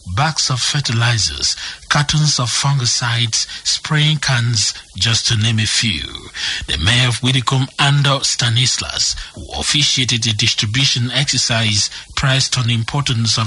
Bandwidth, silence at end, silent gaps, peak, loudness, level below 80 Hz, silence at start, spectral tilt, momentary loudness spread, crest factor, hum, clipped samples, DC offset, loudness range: 11.5 kHz; 0 s; none; -2 dBFS; -15 LUFS; -36 dBFS; 0.05 s; -3 dB/octave; 5 LU; 16 dB; none; under 0.1%; under 0.1%; 1 LU